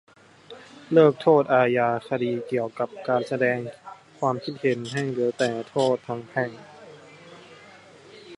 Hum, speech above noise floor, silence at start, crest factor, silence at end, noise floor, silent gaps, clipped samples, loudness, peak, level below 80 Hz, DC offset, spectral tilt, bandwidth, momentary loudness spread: none; 26 dB; 0.5 s; 20 dB; 0 s; -49 dBFS; none; under 0.1%; -24 LUFS; -4 dBFS; -72 dBFS; under 0.1%; -6.5 dB/octave; 11.5 kHz; 18 LU